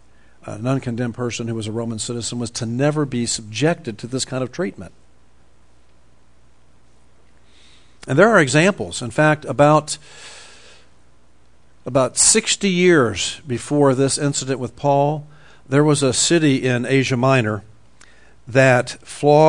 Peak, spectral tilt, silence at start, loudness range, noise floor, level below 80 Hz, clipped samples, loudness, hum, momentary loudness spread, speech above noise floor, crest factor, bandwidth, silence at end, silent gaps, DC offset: 0 dBFS; -4.5 dB/octave; 0.45 s; 8 LU; -56 dBFS; -54 dBFS; under 0.1%; -18 LUFS; none; 14 LU; 38 dB; 20 dB; 10.5 kHz; 0 s; none; 0.5%